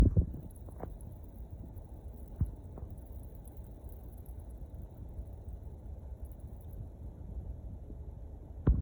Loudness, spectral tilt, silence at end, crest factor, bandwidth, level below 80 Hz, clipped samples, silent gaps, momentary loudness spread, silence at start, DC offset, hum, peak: -43 LUFS; -10 dB/octave; 0 s; 24 dB; over 20 kHz; -42 dBFS; under 0.1%; none; 10 LU; 0 s; under 0.1%; none; -14 dBFS